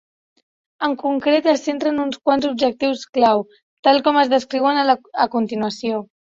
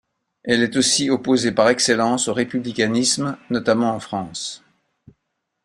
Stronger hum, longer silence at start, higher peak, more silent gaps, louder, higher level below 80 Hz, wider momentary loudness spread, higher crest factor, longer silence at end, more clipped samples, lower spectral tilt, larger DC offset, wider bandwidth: neither; first, 0.8 s vs 0.45 s; about the same, -2 dBFS vs -2 dBFS; first, 3.09-3.13 s, 3.62-3.83 s vs none; about the same, -19 LUFS vs -19 LUFS; about the same, -62 dBFS vs -60 dBFS; second, 7 LU vs 12 LU; about the same, 18 dB vs 20 dB; second, 0.35 s vs 1.05 s; neither; first, -4.5 dB/octave vs -3 dB/octave; neither; second, 7.8 kHz vs 15.5 kHz